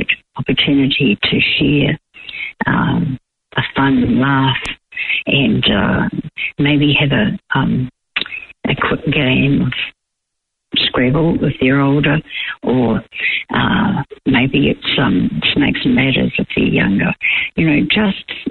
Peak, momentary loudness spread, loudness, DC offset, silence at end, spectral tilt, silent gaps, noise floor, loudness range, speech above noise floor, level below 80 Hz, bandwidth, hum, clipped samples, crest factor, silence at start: -2 dBFS; 9 LU; -15 LUFS; under 0.1%; 0 s; -7.5 dB/octave; none; -75 dBFS; 2 LU; 61 dB; -38 dBFS; 8.2 kHz; none; under 0.1%; 14 dB; 0 s